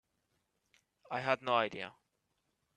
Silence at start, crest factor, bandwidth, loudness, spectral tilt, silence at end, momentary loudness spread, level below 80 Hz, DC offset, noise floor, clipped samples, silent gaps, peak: 1.1 s; 26 dB; 9.8 kHz; -35 LUFS; -5 dB/octave; 0.85 s; 14 LU; -80 dBFS; under 0.1%; -82 dBFS; under 0.1%; none; -14 dBFS